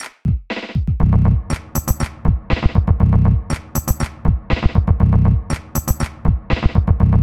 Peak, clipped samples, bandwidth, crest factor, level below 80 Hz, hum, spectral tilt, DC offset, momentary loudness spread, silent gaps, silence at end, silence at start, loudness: 0 dBFS; under 0.1%; 17 kHz; 16 dB; -20 dBFS; none; -6.5 dB/octave; under 0.1%; 8 LU; none; 0 s; 0 s; -18 LUFS